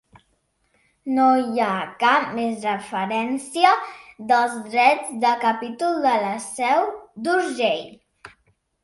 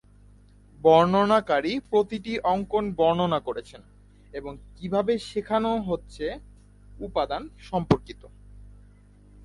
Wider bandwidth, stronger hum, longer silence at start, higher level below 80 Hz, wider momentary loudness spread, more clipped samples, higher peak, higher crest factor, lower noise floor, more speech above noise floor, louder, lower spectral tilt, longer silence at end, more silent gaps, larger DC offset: about the same, 11.5 kHz vs 11.5 kHz; second, none vs 50 Hz at -50 dBFS; first, 1.05 s vs 0.85 s; second, -68 dBFS vs -50 dBFS; second, 9 LU vs 19 LU; neither; about the same, -2 dBFS vs -2 dBFS; about the same, 20 dB vs 24 dB; first, -68 dBFS vs -53 dBFS; first, 47 dB vs 28 dB; first, -21 LUFS vs -25 LUFS; second, -3.5 dB/octave vs -7 dB/octave; second, 0.55 s vs 0.8 s; neither; neither